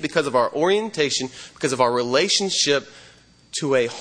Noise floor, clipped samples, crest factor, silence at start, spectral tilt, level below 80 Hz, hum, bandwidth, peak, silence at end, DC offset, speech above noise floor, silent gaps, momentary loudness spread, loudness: -48 dBFS; under 0.1%; 18 dB; 0 s; -3 dB/octave; -64 dBFS; none; 10.5 kHz; -4 dBFS; 0 s; under 0.1%; 27 dB; none; 9 LU; -21 LUFS